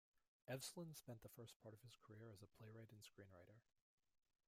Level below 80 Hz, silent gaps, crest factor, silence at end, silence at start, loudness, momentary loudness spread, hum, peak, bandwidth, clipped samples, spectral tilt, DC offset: -88 dBFS; 0.28-0.40 s, 1.56-1.60 s; 22 dB; 0.85 s; 0.15 s; -60 LUFS; 13 LU; none; -38 dBFS; 16 kHz; under 0.1%; -4.5 dB/octave; under 0.1%